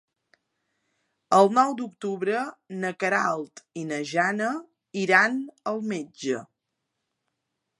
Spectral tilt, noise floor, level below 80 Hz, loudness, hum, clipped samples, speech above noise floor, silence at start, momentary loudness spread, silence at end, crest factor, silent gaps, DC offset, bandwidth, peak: -4.5 dB/octave; -81 dBFS; -82 dBFS; -25 LUFS; none; under 0.1%; 56 dB; 1.3 s; 13 LU; 1.35 s; 22 dB; none; under 0.1%; 11.5 kHz; -4 dBFS